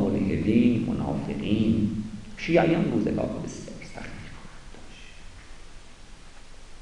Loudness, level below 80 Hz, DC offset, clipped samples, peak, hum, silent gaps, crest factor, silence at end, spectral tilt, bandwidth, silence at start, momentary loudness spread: -25 LUFS; -44 dBFS; under 0.1%; under 0.1%; -8 dBFS; none; none; 18 dB; 0 s; -7.5 dB/octave; 10.5 kHz; 0 s; 25 LU